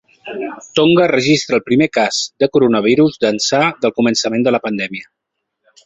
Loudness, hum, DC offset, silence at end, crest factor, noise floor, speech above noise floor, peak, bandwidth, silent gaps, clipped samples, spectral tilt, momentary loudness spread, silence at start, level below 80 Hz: -14 LUFS; none; under 0.1%; 0.85 s; 14 dB; -63 dBFS; 49 dB; 0 dBFS; 8.2 kHz; none; under 0.1%; -4.5 dB/octave; 12 LU; 0.25 s; -56 dBFS